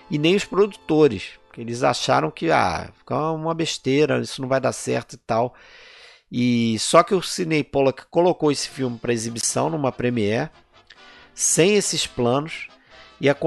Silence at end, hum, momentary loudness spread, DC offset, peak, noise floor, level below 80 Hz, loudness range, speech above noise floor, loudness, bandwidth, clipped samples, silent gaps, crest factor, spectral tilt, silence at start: 0 s; none; 11 LU; under 0.1%; -2 dBFS; -49 dBFS; -54 dBFS; 3 LU; 28 dB; -21 LUFS; 12 kHz; under 0.1%; none; 20 dB; -4 dB/octave; 0.1 s